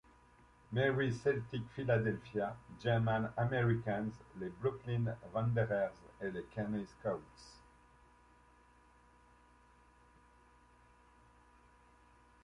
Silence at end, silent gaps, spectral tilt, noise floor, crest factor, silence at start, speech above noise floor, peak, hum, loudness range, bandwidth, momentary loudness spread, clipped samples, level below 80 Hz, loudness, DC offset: 4.85 s; none; -8 dB/octave; -66 dBFS; 20 dB; 0.7 s; 29 dB; -20 dBFS; none; 11 LU; 10 kHz; 11 LU; under 0.1%; -64 dBFS; -37 LUFS; under 0.1%